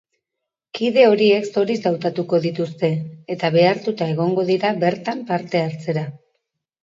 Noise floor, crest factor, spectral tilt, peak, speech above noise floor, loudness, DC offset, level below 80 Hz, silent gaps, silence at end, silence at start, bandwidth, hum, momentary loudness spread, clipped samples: -83 dBFS; 20 dB; -7 dB/octave; 0 dBFS; 64 dB; -19 LUFS; under 0.1%; -68 dBFS; none; 0.65 s; 0.75 s; 7.6 kHz; none; 11 LU; under 0.1%